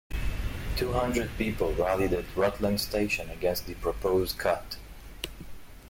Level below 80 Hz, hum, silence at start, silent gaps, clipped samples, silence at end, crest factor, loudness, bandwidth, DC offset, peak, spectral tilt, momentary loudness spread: -38 dBFS; none; 0.1 s; none; under 0.1%; 0 s; 16 dB; -30 LUFS; 16.5 kHz; under 0.1%; -14 dBFS; -5 dB/octave; 12 LU